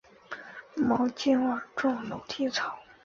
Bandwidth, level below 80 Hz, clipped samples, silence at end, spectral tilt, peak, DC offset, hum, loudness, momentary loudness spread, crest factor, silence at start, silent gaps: 7.4 kHz; -66 dBFS; under 0.1%; 0.25 s; -4.5 dB/octave; -14 dBFS; under 0.1%; none; -29 LUFS; 16 LU; 16 dB; 0.3 s; none